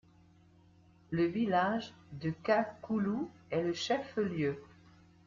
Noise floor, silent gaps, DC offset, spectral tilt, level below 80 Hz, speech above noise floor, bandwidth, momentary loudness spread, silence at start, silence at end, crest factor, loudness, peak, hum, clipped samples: -63 dBFS; none; under 0.1%; -6 dB/octave; -68 dBFS; 29 dB; 7.6 kHz; 9 LU; 1.1 s; 0.6 s; 18 dB; -34 LUFS; -16 dBFS; none; under 0.1%